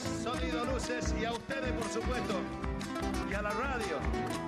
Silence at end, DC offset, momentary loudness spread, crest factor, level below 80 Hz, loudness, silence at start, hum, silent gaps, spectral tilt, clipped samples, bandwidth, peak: 0 s; under 0.1%; 2 LU; 12 dB; -42 dBFS; -35 LUFS; 0 s; none; none; -5 dB/octave; under 0.1%; 14 kHz; -22 dBFS